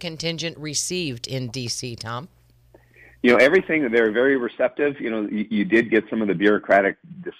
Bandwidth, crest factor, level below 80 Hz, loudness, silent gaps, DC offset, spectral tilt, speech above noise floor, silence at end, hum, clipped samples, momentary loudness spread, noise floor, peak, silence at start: 15 kHz; 16 dB; -58 dBFS; -21 LUFS; none; under 0.1%; -4.5 dB/octave; 33 dB; 0.1 s; none; under 0.1%; 12 LU; -54 dBFS; -6 dBFS; 0 s